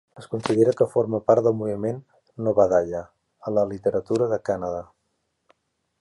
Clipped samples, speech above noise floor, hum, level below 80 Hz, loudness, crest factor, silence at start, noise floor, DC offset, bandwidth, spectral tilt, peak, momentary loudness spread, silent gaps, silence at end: under 0.1%; 52 dB; none; -56 dBFS; -23 LUFS; 18 dB; 0.15 s; -74 dBFS; under 0.1%; 11.5 kHz; -7.5 dB/octave; -4 dBFS; 13 LU; none; 1.15 s